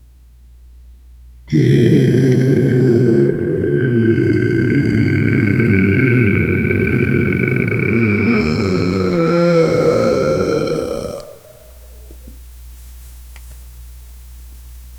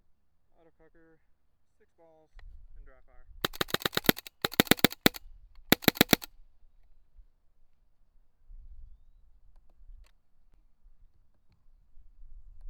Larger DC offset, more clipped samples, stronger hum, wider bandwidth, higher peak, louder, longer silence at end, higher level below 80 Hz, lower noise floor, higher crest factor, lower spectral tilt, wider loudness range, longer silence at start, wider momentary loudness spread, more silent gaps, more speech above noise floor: neither; neither; neither; second, 18 kHz vs over 20 kHz; about the same, 0 dBFS vs 0 dBFS; first, -14 LUFS vs -27 LUFS; about the same, 0 s vs 0 s; first, -38 dBFS vs -54 dBFS; second, -43 dBFS vs -67 dBFS; second, 16 dB vs 34 dB; first, -8 dB/octave vs -3.5 dB/octave; second, 7 LU vs 10 LU; second, 1.45 s vs 2.4 s; second, 5 LU vs 12 LU; neither; first, 32 dB vs 14 dB